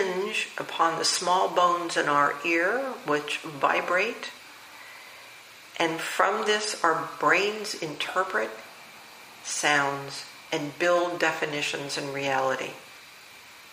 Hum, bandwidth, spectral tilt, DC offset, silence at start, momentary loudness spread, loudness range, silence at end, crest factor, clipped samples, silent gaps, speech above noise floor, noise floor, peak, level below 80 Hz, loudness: none; 15.5 kHz; -2.5 dB/octave; under 0.1%; 0 s; 22 LU; 4 LU; 0 s; 22 dB; under 0.1%; none; 22 dB; -48 dBFS; -6 dBFS; -76 dBFS; -26 LUFS